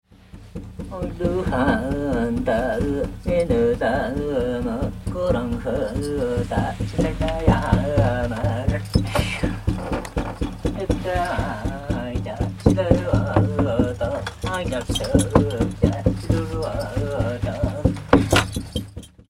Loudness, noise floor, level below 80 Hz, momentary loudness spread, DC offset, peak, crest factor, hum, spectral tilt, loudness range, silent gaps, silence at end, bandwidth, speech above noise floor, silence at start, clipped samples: -23 LUFS; -43 dBFS; -32 dBFS; 8 LU; under 0.1%; 0 dBFS; 22 dB; none; -6.5 dB/octave; 3 LU; none; 0.25 s; 15.5 kHz; 22 dB; 0.35 s; under 0.1%